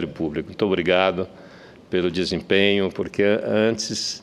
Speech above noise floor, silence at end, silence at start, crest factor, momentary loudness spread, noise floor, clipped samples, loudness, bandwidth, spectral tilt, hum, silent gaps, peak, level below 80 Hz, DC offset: 23 dB; 0 s; 0 s; 20 dB; 9 LU; -45 dBFS; under 0.1%; -22 LUFS; 12 kHz; -4.5 dB/octave; none; none; -2 dBFS; -54 dBFS; under 0.1%